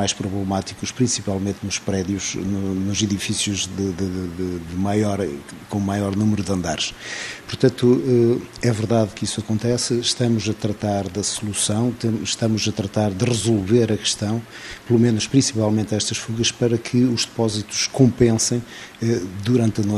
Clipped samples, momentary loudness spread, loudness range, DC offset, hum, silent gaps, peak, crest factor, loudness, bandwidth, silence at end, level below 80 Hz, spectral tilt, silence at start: under 0.1%; 8 LU; 4 LU; under 0.1%; none; none; -2 dBFS; 20 dB; -21 LUFS; 13.5 kHz; 0 s; -50 dBFS; -5 dB/octave; 0 s